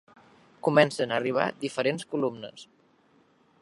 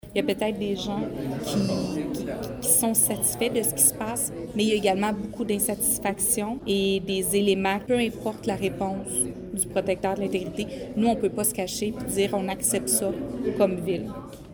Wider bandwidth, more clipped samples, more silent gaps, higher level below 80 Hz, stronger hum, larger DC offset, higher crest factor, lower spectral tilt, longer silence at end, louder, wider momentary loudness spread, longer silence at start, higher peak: second, 11.5 kHz vs over 20 kHz; neither; neither; second, -76 dBFS vs -50 dBFS; neither; neither; about the same, 24 dB vs 20 dB; first, -5 dB/octave vs -3.5 dB/octave; first, 1 s vs 0 s; about the same, -27 LUFS vs -25 LUFS; about the same, 10 LU vs 9 LU; first, 0.65 s vs 0.05 s; about the same, -4 dBFS vs -6 dBFS